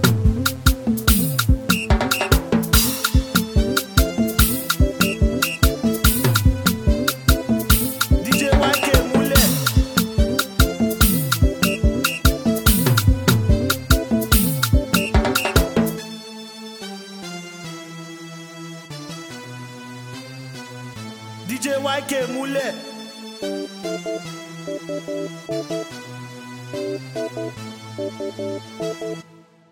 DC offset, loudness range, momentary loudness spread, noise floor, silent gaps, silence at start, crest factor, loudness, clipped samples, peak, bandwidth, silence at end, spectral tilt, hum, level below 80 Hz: under 0.1%; 16 LU; 18 LU; -49 dBFS; none; 0 s; 20 dB; -19 LUFS; under 0.1%; 0 dBFS; 19.5 kHz; 0.5 s; -4.5 dB/octave; none; -26 dBFS